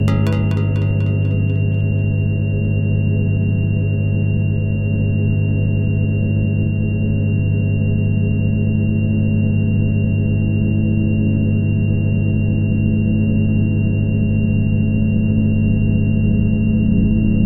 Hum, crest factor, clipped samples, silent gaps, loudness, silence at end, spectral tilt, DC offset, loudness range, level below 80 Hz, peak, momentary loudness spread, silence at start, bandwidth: none; 12 dB; under 0.1%; none; -17 LUFS; 0 s; -10 dB/octave; under 0.1%; 1 LU; -28 dBFS; -4 dBFS; 2 LU; 0 s; 3.6 kHz